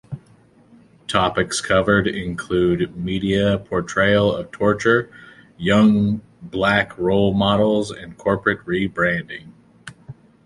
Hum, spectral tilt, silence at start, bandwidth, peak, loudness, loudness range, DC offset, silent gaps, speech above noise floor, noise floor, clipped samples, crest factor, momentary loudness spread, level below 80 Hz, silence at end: none; -5.5 dB/octave; 0.1 s; 11.5 kHz; -2 dBFS; -19 LUFS; 2 LU; under 0.1%; none; 33 dB; -52 dBFS; under 0.1%; 18 dB; 13 LU; -44 dBFS; 0.35 s